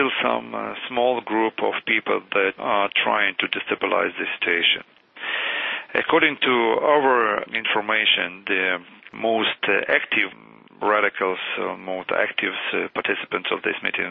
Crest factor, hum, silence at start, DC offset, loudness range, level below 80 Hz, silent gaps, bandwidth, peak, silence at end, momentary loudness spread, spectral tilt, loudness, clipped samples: 20 dB; none; 0 s; under 0.1%; 4 LU; -66 dBFS; none; 5 kHz; -2 dBFS; 0 s; 8 LU; -6.5 dB/octave; -21 LUFS; under 0.1%